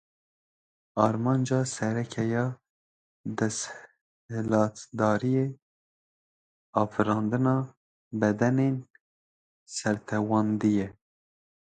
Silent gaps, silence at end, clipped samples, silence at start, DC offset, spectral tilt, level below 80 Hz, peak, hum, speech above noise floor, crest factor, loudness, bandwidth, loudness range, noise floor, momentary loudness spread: 2.70-3.24 s, 4.01-4.29 s, 5.62-6.73 s, 7.77-8.11 s, 9.01-9.66 s; 0.7 s; under 0.1%; 0.95 s; under 0.1%; -6.5 dB/octave; -64 dBFS; -6 dBFS; none; over 64 dB; 22 dB; -28 LUFS; 9.4 kHz; 2 LU; under -90 dBFS; 13 LU